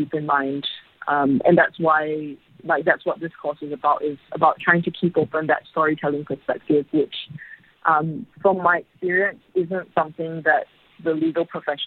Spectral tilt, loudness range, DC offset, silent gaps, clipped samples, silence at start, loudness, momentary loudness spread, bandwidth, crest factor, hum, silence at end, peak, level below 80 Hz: -9 dB/octave; 2 LU; under 0.1%; none; under 0.1%; 0 s; -22 LUFS; 11 LU; 4.5 kHz; 22 dB; none; 0 s; 0 dBFS; -66 dBFS